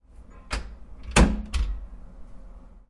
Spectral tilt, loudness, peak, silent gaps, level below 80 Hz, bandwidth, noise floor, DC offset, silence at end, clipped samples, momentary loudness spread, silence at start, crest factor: -4.5 dB/octave; -26 LUFS; -4 dBFS; none; -30 dBFS; 11.5 kHz; -47 dBFS; under 0.1%; 0.1 s; under 0.1%; 24 LU; 0.15 s; 24 dB